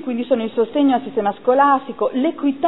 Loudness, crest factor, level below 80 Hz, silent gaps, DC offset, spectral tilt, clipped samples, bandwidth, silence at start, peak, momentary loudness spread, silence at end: -18 LUFS; 16 dB; -62 dBFS; none; 0.5%; -9.5 dB/octave; under 0.1%; 4.1 kHz; 0 s; -2 dBFS; 6 LU; 0 s